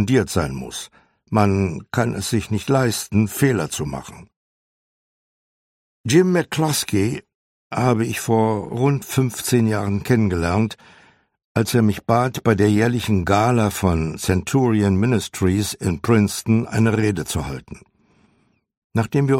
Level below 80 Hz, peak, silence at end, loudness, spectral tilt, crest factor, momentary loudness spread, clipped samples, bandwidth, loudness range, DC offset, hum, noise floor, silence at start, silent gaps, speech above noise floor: -44 dBFS; -2 dBFS; 0 s; -20 LUFS; -6 dB/octave; 18 dB; 9 LU; under 0.1%; 16.5 kHz; 4 LU; under 0.1%; none; -63 dBFS; 0 s; 4.36-6.04 s, 7.35-7.70 s, 11.44-11.55 s, 18.77-18.90 s; 44 dB